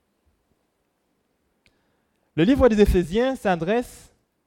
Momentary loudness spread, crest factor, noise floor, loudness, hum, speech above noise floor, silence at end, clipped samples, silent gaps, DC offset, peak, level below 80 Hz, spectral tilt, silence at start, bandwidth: 10 LU; 20 dB; -71 dBFS; -21 LUFS; none; 52 dB; 0.6 s; under 0.1%; none; under 0.1%; -4 dBFS; -36 dBFS; -7 dB/octave; 2.35 s; 16.5 kHz